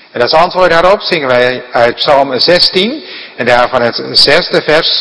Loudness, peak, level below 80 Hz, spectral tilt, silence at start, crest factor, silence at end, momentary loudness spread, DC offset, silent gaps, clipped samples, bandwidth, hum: -8 LUFS; 0 dBFS; -38 dBFS; -4 dB/octave; 0.15 s; 10 dB; 0 s; 6 LU; under 0.1%; none; 3%; 11 kHz; none